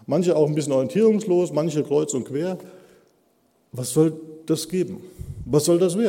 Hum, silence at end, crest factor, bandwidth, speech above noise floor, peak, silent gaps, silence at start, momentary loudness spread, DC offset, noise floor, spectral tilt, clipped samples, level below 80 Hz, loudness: none; 0 s; 16 dB; 16.5 kHz; 42 dB; -6 dBFS; none; 0.1 s; 17 LU; under 0.1%; -64 dBFS; -6 dB/octave; under 0.1%; -52 dBFS; -22 LUFS